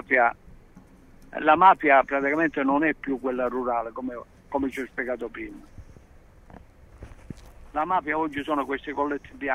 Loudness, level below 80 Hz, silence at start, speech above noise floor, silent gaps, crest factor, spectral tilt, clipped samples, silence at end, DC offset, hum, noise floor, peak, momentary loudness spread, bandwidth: -24 LUFS; -52 dBFS; 0.1 s; 27 dB; none; 22 dB; -6.5 dB/octave; under 0.1%; 0 s; under 0.1%; none; -51 dBFS; -4 dBFS; 20 LU; 13.5 kHz